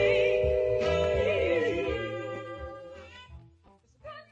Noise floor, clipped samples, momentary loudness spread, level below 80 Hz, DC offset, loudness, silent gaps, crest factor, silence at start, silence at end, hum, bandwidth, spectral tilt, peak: -61 dBFS; under 0.1%; 21 LU; -46 dBFS; under 0.1%; -28 LUFS; none; 16 dB; 0 s; 0.1 s; none; 8 kHz; -6 dB/octave; -12 dBFS